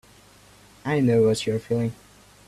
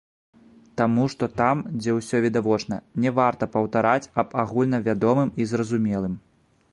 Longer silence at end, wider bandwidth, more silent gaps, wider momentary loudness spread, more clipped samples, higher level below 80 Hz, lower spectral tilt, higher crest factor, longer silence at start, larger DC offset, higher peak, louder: about the same, 0.55 s vs 0.55 s; first, 13.5 kHz vs 11.5 kHz; neither; first, 10 LU vs 5 LU; neither; about the same, -56 dBFS vs -56 dBFS; about the same, -6.5 dB/octave vs -7 dB/octave; about the same, 16 dB vs 20 dB; about the same, 0.85 s vs 0.75 s; neither; second, -10 dBFS vs -4 dBFS; about the same, -23 LUFS vs -23 LUFS